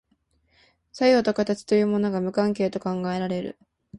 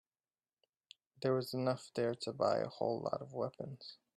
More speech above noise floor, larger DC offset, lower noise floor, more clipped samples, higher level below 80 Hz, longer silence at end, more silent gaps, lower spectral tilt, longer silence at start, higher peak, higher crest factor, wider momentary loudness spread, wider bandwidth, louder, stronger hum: second, 45 dB vs over 52 dB; neither; second, -68 dBFS vs under -90 dBFS; neither; first, -62 dBFS vs -80 dBFS; second, 0 s vs 0.25 s; neither; about the same, -6.5 dB/octave vs -6 dB/octave; second, 0.95 s vs 1.2 s; first, -8 dBFS vs -20 dBFS; about the same, 16 dB vs 18 dB; about the same, 9 LU vs 9 LU; second, 11 kHz vs 13 kHz; first, -24 LUFS vs -38 LUFS; neither